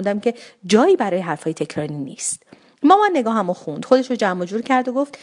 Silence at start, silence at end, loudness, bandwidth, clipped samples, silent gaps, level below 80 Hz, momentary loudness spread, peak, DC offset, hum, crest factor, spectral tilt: 0 s; 0.05 s; -19 LUFS; 11 kHz; under 0.1%; none; -70 dBFS; 11 LU; 0 dBFS; under 0.1%; none; 18 dB; -4.5 dB/octave